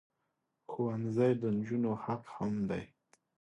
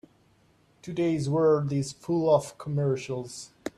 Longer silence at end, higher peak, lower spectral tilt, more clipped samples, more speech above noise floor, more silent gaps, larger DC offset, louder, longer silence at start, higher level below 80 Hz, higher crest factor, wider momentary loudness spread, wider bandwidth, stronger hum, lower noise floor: first, 0.55 s vs 0.1 s; second, -18 dBFS vs -10 dBFS; first, -9 dB/octave vs -7 dB/octave; neither; first, 50 dB vs 37 dB; neither; neither; second, -35 LUFS vs -27 LUFS; second, 0.7 s vs 0.85 s; about the same, -68 dBFS vs -64 dBFS; about the same, 18 dB vs 18 dB; second, 10 LU vs 14 LU; second, 9 kHz vs 12.5 kHz; neither; first, -83 dBFS vs -63 dBFS